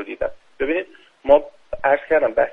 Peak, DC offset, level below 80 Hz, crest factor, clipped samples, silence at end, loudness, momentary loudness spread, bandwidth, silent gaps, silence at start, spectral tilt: 0 dBFS; under 0.1%; -46 dBFS; 20 dB; under 0.1%; 0 s; -20 LUFS; 14 LU; 3.9 kHz; none; 0 s; -6.5 dB/octave